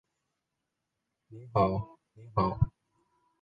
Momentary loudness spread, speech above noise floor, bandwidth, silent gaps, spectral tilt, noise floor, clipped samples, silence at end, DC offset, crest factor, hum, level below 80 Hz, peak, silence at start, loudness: 15 LU; 55 dB; 5 kHz; none; -10.5 dB/octave; -85 dBFS; under 0.1%; 0.75 s; under 0.1%; 22 dB; none; -48 dBFS; -12 dBFS; 1.3 s; -31 LUFS